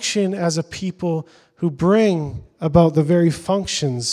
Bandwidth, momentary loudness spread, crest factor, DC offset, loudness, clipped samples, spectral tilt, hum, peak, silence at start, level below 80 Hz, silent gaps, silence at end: 12 kHz; 10 LU; 18 dB; under 0.1%; -19 LUFS; under 0.1%; -5.5 dB/octave; none; 0 dBFS; 0 s; -46 dBFS; none; 0 s